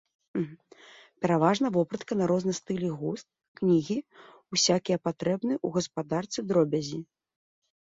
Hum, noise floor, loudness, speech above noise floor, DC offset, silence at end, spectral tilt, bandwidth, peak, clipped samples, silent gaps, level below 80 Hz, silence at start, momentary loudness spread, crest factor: none; -54 dBFS; -28 LUFS; 26 dB; under 0.1%; 0.9 s; -5 dB/octave; 7.8 kHz; -10 dBFS; under 0.1%; 3.48-3.55 s; -68 dBFS; 0.35 s; 10 LU; 20 dB